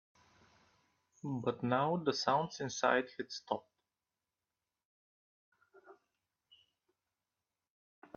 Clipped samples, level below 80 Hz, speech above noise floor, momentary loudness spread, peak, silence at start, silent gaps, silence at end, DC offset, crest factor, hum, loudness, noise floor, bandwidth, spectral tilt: under 0.1%; -80 dBFS; over 55 dB; 10 LU; -16 dBFS; 1.25 s; 4.85-5.52 s; 2.25 s; under 0.1%; 24 dB; none; -36 LUFS; under -90 dBFS; 7 kHz; -3.5 dB/octave